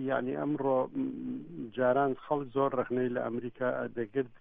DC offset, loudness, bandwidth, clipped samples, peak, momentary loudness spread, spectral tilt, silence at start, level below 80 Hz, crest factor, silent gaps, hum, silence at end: under 0.1%; -32 LUFS; 3.8 kHz; under 0.1%; -14 dBFS; 8 LU; -10.5 dB/octave; 0 s; -66 dBFS; 16 dB; none; none; 0.05 s